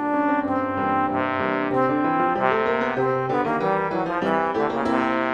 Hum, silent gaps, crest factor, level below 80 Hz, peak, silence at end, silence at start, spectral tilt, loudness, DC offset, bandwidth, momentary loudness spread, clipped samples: none; none; 16 dB; -56 dBFS; -6 dBFS; 0 s; 0 s; -7.5 dB/octave; -22 LUFS; under 0.1%; 9 kHz; 2 LU; under 0.1%